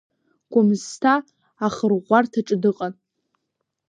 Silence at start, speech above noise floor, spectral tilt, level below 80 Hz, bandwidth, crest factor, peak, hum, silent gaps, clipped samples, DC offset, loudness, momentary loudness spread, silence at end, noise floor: 0.5 s; 59 dB; -6 dB/octave; -68 dBFS; 9.6 kHz; 20 dB; -2 dBFS; none; none; under 0.1%; under 0.1%; -21 LUFS; 8 LU; 1 s; -78 dBFS